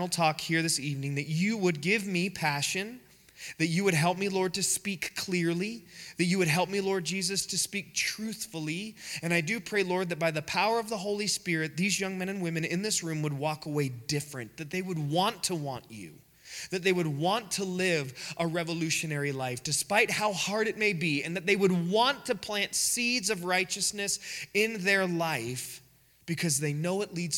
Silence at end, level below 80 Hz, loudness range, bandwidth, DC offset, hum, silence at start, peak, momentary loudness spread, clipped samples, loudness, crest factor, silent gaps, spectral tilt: 0 s; -68 dBFS; 4 LU; 18.5 kHz; under 0.1%; none; 0 s; -8 dBFS; 10 LU; under 0.1%; -29 LUFS; 22 dB; none; -3.5 dB/octave